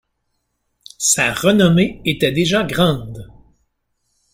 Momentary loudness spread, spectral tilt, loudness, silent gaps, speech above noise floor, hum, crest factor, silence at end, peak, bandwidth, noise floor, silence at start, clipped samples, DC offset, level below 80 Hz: 10 LU; -4 dB/octave; -16 LUFS; none; 55 dB; none; 18 dB; 1.1 s; 0 dBFS; 16.5 kHz; -71 dBFS; 1 s; under 0.1%; under 0.1%; -46 dBFS